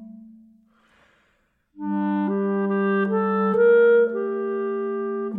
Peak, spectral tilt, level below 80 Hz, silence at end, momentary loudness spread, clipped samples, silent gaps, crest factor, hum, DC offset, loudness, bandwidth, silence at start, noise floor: -8 dBFS; -10.5 dB/octave; -68 dBFS; 0 s; 11 LU; under 0.1%; none; 14 dB; none; under 0.1%; -21 LUFS; 4 kHz; 0 s; -67 dBFS